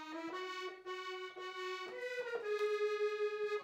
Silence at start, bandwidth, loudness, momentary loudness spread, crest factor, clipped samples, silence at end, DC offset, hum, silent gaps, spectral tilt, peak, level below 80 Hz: 0 s; 15 kHz; -41 LUFS; 9 LU; 12 dB; under 0.1%; 0 s; under 0.1%; none; none; -2 dB/octave; -28 dBFS; under -90 dBFS